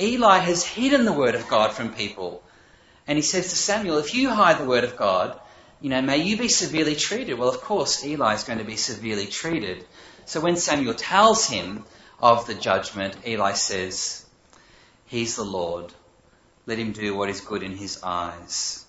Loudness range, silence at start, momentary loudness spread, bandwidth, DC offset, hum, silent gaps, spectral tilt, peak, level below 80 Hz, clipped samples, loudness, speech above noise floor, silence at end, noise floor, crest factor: 8 LU; 0 s; 13 LU; 8.2 kHz; under 0.1%; none; none; -3 dB/octave; -2 dBFS; -56 dBFS; under 0.1%; -23 LUFS; 35 dB; 0.05 s; -58 dBFS; 22 dB